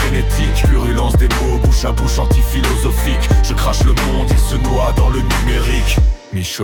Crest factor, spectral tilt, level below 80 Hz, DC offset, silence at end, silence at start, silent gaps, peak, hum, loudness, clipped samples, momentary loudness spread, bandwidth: 10 dB; -5 dB/octave; -14 dBFS; under 0.1%; 0 s; 0 s; none; -2 dBFS; none; -15 LUFS; under 0.1%; 2 LU; 18 kHz